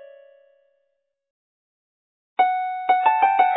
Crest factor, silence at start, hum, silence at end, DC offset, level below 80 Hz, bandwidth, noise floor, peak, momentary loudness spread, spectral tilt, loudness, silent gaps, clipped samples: 18 dB; 2.4 s; none; 0 s; under 0.1%; -80 dBFS; 4 kHz; -74 dBFS; -6 dBFS; 7 LU; -5.5 dB/octave; -20 LUFS; none; under 0.1%